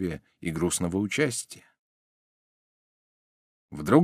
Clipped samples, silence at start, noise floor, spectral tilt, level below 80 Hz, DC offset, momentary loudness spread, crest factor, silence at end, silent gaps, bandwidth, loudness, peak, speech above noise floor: under 0.1%; 0 s; under -90 dBFS; -5 dB/octave; -56 dBFS; under 0.1%; 17 LU; 24 dB; 0 s; 1.79-3.69 s; 15.5 kHz; -28 LUFS; -6 dBFS; over 64 dB